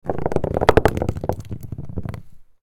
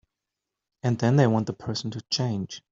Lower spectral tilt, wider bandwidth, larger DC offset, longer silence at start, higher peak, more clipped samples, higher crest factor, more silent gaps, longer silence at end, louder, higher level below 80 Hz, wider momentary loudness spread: about the same, -7 dB/octave vs -6 dB/octave; first, 19 kHz vs 7.6 kHz; neither; second, 0.05 s vs 0.85 s; first, 0 dBFS vs -6 dBFS; neither; about the same, 22 dB vs 20 dB; neither; about the same, 0.2 s vs 0.15 s; first, -22 LUFS vs -26 LUFS; first, -34 dBFS vs -62 dBFS; first, 17 LU vs 11 LU